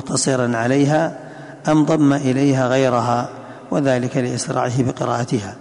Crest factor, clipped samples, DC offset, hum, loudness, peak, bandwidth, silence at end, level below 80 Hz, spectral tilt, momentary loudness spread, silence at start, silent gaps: 14 dB; under 0.1%; under 0.1%; none; -18 LUFS; -4 dBFS; 11 kHz; 0 s; -54 dBFS; -5.5 dB/octave; 8 LU; 0 s; none